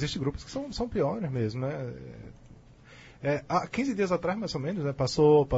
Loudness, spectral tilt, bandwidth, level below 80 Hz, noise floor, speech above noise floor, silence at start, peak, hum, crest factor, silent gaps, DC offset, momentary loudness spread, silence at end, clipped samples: -29 LUFS; -6.5 dB/octave; 8 kHz; -50 dBFS; -52 dBFS; 24 dB; 0 s; -12 dBFS; none; 16 dB; none; under 0.1%; 13 LU; 0 s; under 0.1%